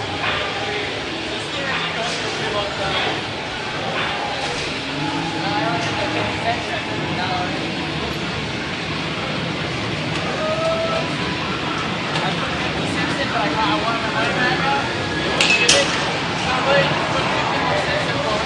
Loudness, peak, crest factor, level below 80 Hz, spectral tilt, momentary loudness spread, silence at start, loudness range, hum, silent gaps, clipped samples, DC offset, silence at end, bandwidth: -20 LUFS; 0 dBFS; 22 dB; -46 dBFS; -3.5 dB/octave; 7 LU; 0 s; 6 LU; none; none; under 0.1%; under 0.1%; 0 s; 12 kHz